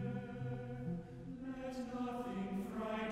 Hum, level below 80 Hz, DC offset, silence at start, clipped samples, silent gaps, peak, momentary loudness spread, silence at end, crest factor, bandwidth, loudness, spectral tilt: none; -62 dBFS; under 0.1%; 0 s; under 0.1%; none; -28 dBFS; 5 LU; 0 s; 14 dB; 15.5 kHz; -44 LUFS; -7.5 dB/octave